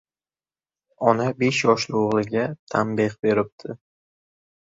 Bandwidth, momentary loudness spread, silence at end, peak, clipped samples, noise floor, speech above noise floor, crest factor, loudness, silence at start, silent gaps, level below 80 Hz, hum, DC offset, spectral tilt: 7.8 kHz; 11 LU; 0.95 s; -2 dBFS; under 0.1%; under -90 dBFS; over 68 dB; 22 dB; -22 LUFS; 1 s; 2.59-2.67 s, 3.19-3.23 s, 3.52-3.58 s; -62 dBFS; none; under 0.1%; -5.5 dB/octave